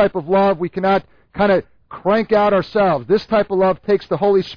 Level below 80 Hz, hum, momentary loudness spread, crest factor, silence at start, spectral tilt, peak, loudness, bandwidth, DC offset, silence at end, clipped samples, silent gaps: -48 dBFS; none; 5 LU; 12 dB; 0 s; -8 dB/octave; -4 dBFS; -17 LUFS; 5.4 kHz; under 0.1%; 0 s; under 0.1%; none